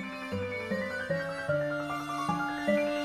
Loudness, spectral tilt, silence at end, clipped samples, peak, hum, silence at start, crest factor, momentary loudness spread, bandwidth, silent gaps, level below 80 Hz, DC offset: -32 LUFS; -6 dB/octave; 0 s; under 0.1%; -16 dBFS; none; 0 s; 16 dB; 6 LU; 15 kHz; none; -64 dBFS; under 0.1%